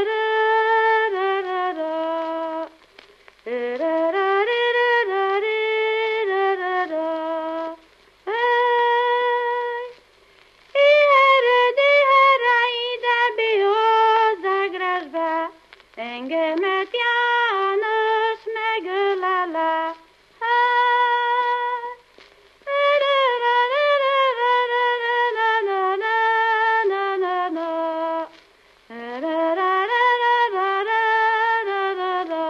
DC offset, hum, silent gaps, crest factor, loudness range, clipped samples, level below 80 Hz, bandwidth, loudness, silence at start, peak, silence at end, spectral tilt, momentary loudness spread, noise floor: under 0.1%; none; none; 14 dB; 6 LU; under 0.1%; -70 dBFS; 7.6 kHz; -20 LUFS; 0 s; -6 dBFS; 0 s; -2.5 dB/octave; 11 LU; -54 dBFS